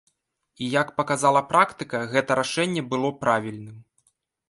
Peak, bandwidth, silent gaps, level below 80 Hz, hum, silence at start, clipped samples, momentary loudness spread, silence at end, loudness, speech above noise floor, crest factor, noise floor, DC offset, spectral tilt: -4 dBFS; 11.5 kHz; none; -66 dBFS; none; 0.6 s; under 0.1%; 12 LU; 0.7 s; -23 LUFS; 48 dB; 20 dB; -71 dBFS; under 0.1%; -4.5 dB/octave